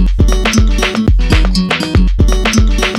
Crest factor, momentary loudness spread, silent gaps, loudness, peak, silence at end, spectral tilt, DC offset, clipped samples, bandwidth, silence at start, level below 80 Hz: 8 dB; 2 LU; none; -12 LUFS; 0 dBFS; 0 s; -5 dB/octave; under 0.1%; under 0.1%; 13.5 kHz; 0 s; -12 dBFS